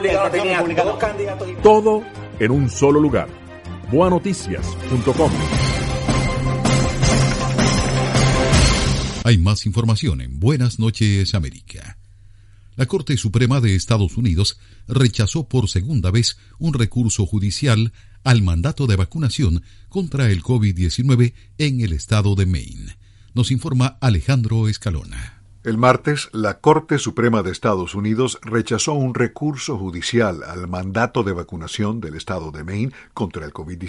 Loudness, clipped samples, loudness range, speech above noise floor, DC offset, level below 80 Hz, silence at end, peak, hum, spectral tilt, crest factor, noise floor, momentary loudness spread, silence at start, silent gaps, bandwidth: -19 LUFS; under 0.1%; 4 LU; 26 dB; under 0.1%; -32 dBFS; 0 s; 0 dBFS; none; -5.5 dB/octave; 18 dB; -45 dBFS; 11 LU; 0 s; none; 11.5 kHz